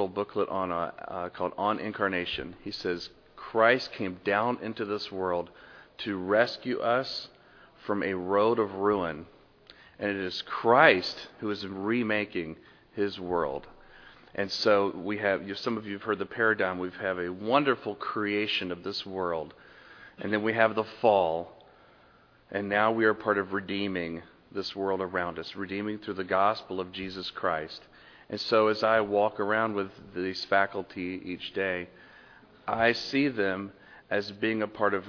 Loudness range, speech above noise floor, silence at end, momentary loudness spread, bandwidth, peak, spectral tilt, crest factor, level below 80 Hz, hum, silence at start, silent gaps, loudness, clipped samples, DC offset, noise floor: 5 LU; 31 dB; 0 s; 12 LU; 5.4 kHz; -4 dBFS; -5.5 dB/octave; 24 dB; -64 dBFS; none; 0 s; none; -29 LUFS; under 0.1%; under 0.1%; -59 dBFS